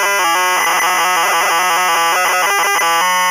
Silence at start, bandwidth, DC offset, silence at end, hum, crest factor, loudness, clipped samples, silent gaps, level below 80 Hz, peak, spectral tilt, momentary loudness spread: 0 s; 16 kHz; under 0.1%; 0 s; none; 8 dB; -12 LUFS; under 0.1%; none; -68 dBFS; -6 dBFS; 0.5 dB/octave; 0 LU